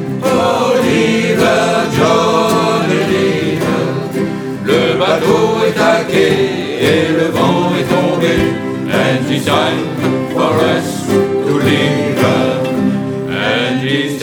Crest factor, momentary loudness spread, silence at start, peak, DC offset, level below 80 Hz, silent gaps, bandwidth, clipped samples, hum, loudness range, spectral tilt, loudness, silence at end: 12 dB; 5 LU; 0 s; 0 dBFS; under 0.1%; -44 dBFS; none; over 20 kHz; under 0.1%; none; 2 LU; -5.5 dB/octave; -13 LUFS; 0 s